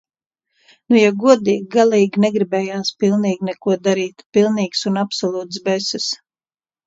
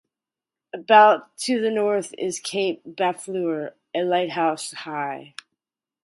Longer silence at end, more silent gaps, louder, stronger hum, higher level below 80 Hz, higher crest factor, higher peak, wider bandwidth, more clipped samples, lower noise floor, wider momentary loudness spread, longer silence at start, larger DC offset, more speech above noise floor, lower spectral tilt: about the same, 0.7 s vs 0.8 s; first, 4.26-4.30 s vs none; first, -17 LUFS vs -22 LUFS; neither; first, -66 dBFS vs -78 dBFS; about the same, 18 dB vs 20 dB; about the same, 0 dBFS vs -2 dBFS; second, 8 kHz vs 11.5 kHz; neither; about the same, under -90 dBFS vs -89 dBFS; second, 8 LU vs 16 LU; first, 0.9 s vs 0.75 s; neither; first, over 73 dB vs 67 dB; first, -5 dB/octave vs -3.5 dB/octave